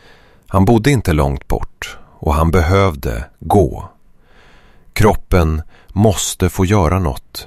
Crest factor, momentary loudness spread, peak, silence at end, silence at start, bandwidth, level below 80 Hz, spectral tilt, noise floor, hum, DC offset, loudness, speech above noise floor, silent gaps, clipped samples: 14 dB; 14 LU; 0 dBFS; 0 s; 0.5 s; 15 kHz; -24 dBFS; -6 dB/octave; -45 dBFS; none; under 0.1%; -15 LUFS; 31 dB; none; under 0.1%